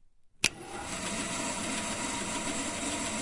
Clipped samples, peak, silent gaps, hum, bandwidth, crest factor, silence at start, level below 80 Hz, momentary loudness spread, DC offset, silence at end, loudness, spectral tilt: under 0.1%; -8 dBFS; none; none; 11.5 kHz; 28 dB; 0.2 s; -54 dBFS; 4 LU; under 0.1%; 0 s; -33 LUFS; -2 dB/octave